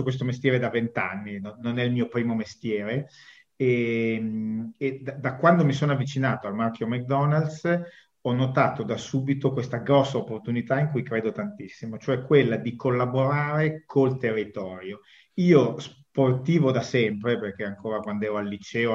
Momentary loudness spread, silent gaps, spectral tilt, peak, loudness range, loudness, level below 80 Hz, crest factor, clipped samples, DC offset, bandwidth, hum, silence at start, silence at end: 12 LU; none; -7.5 dB/octave; -6 dBFS; 3 LU; -25 LUFS; -66 dBFS; 20 dB; under 0.1%; under 0.1%; 7.6 kHz; none; 0 s; 0 s